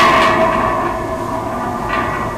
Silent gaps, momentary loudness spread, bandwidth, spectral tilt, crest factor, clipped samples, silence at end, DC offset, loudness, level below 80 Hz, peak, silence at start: none; 10 LU; 16 kHz; -5 dB/octave; 12 dB; under 0.1%; 0 s; under 0.1%; -16 LUFS; -34 dBFS; -2 dBFS; 0 s